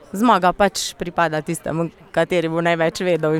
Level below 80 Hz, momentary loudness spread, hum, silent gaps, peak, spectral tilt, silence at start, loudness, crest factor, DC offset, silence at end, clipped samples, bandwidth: -48 dBFS; 9 LU; none; none; -2 dBFS; -5 dB/octave; 0.15 s; -19 LUFS; 16 dB; under 0.1%; 0 s; under 0.1%; 17 kHz